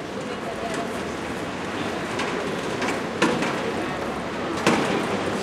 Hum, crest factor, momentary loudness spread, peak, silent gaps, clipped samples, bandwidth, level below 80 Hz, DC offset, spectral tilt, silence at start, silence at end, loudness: none; 24 dB; 7 LU; -2 dBFS; none; under 0.1%; 16 kHz; -52 dBFS; under 0.1%; -4.5 dB/octave; 0 s; 0 s; -26 LUFS